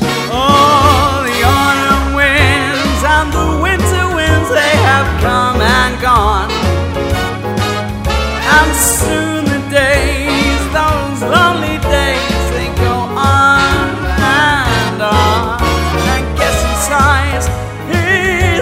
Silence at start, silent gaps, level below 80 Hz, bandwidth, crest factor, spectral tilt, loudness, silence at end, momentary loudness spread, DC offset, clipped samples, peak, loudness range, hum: 0 s; none; -22 dBFS; 16.5 kHz; 12 dB; -4 dB/octave; -12 LUFS; 0 s; 7 LU; under 0.1%; under 0.1%; 0 dBFS; 2 LU; none